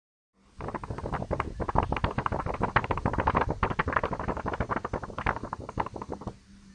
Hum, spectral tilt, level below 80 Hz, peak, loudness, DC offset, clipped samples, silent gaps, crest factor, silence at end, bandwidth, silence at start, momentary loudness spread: none; -7 dB/octave; -40 dBFS; -6 dBFS; -31 LUFS; under 0.1%; under 0.1%; none; 26 dB; 0 s; 10.5 kHz; 0.55 s; 11 LU